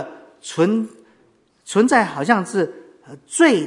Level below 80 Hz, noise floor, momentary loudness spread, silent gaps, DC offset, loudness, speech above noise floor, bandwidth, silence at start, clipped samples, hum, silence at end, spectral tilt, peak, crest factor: -64 dBFS; -58 dBFS; 16 LU; none; under 0.1%; -19 LUFS; 40 dB; 11 kHz; 0 s; under 0.1%; none; 0 s; -4.5 dB/octave; 0 dBFS; 20 dB